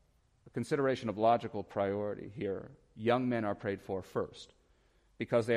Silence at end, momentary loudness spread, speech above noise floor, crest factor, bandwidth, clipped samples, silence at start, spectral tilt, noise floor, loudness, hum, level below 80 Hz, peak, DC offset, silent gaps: 0 s; 13 LU; 35 dB; 18 dB; 14 kHz; under 0.1%; 0.45 s; -7 dB/octave; -69 dBFS; -35 LUFS; none; -68 dBFS; -16 dBFS; under 0.1%; none